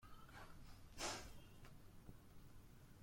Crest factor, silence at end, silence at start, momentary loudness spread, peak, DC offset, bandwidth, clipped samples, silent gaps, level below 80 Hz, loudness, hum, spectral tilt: 22 dB; 0 s; 0 s; 17 LU; -34 dBFS; under 0.1%; 16.5 kHz; under 0.1%; none; -64 dBFS; -56 LUFS; none; -2.5 dB/octave